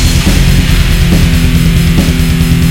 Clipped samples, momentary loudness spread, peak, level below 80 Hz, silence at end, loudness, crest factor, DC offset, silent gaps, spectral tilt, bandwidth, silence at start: 2%; 1 LU; 0 dBFS; -10 dBFS; 0 s; -9 LUFS; 6 dB; under 0.1%; none; -5 dB/octave; 17 kHz; 0 s